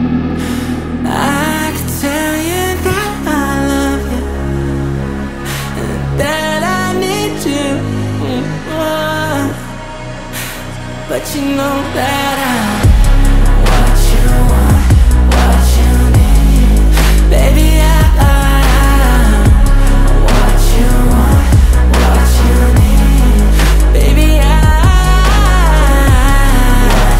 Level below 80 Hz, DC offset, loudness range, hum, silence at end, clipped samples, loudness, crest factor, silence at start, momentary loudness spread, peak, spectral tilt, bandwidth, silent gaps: -10 dBFS; under 0.1%; 7 LU; none; 0 s; under 0.1%; -12 LUFS; 8 dB; 0 s; 9 LU; 0 dBFS; -5.5 dB/octave; 16 kHz; none